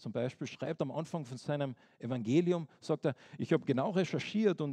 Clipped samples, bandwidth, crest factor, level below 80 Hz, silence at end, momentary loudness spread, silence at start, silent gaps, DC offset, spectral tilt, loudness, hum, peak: under 0.1%; 10 kHz; 18 dB; -80 dBFS; 0 s; 10 LU; 0 s; none; under 0.1%; -7 dB/octave; -35 LUFS; none; -16 dBFS